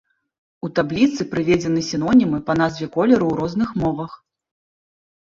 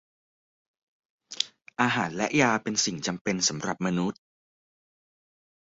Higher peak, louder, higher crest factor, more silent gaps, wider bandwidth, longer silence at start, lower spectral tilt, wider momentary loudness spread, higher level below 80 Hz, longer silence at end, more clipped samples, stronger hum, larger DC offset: about the same, -4 dBFS vs -4 dBFS; first, -19 LUFS vs -27 LUFS; second, 16 dB vs 26 dB; second, none vs 3.21-3.25 s; about the same, 7.6 kHz vs 8 kHz; second, 0.65 s vs 1.3 s; first, -6.5 dB/octave vs -3 dB/octave; about the same, 8 LU vs 8 LU; first, -48 dBFS vs -66 dBFS; second, 1.05 s vs 1.65 s; neither; neither; neither